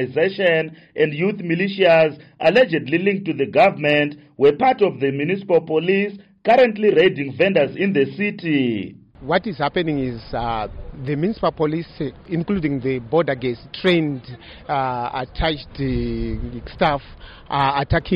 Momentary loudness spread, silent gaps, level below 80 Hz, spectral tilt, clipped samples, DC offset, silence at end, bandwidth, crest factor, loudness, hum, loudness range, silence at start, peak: 11 LU; none; -40 dBFS; -8 dB/octave; under 0.1%; under 0.1%; 0 s; 7.2 kHz; 14 dB; -20 LUFS; none; 6 LU; 0 s; -6 dBFS